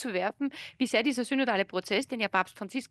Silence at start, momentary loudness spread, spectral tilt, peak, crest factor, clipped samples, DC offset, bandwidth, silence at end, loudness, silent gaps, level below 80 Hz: 0 s; 8 LU; -4 dB/octave; -10 dBFS; 20 dB; under 0.1%; under 0.1%; 12.5 kHz; 0.05 s; -30 LUFS; none; -74 dBFS